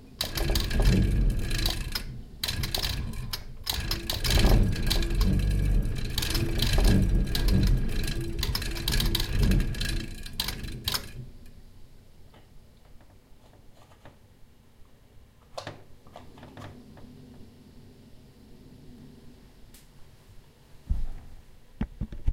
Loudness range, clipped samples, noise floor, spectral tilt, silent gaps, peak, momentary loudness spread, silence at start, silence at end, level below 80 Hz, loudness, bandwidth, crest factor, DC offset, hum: 22 LU; under 0.1%; -53 dBFS; -4.5 dB/octave; none; -10 dBFS; 24 LU; 0 s; 0 s; -30 dBFS; -29 LUFS; 17 kHz; 18 dB; under 0.1%; none